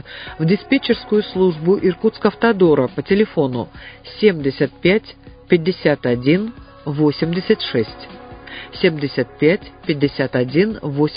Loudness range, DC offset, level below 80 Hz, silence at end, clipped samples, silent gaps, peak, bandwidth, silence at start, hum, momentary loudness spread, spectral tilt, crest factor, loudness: 3 LU; under 0.1%; -46 dBFS; 0 s; under 0.1%; none; 0 dBFS; 5.2 kHz; 0.05 s; none; 14 LU; -11.5 dB/octave; 18 dB; -18 LUFS